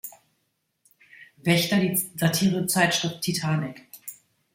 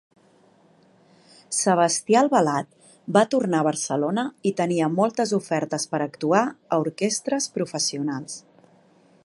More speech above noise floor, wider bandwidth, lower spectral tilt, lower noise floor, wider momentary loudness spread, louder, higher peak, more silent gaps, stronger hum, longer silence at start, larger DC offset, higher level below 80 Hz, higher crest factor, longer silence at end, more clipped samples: first, 51 dB vs 35 dB; first, 16.5 kHz vs 11.5 kHz; about the same, -4 dB/octave vs -4 dB/octave; first, -75 dBFS vs -57 dBFS; first, 19 LU vs 9 LU; about the same, -23 LUFS vs -23 LUFS; second, -6 dBFS vs -2 dBFS; neither; neither; second, 0.05 s vs 1.5 s; neither; first, -64 dBFS vs -74 dBFS; about the same, 20 dB vs 22 dB; second, 0.4 s vs 0.85 s; neither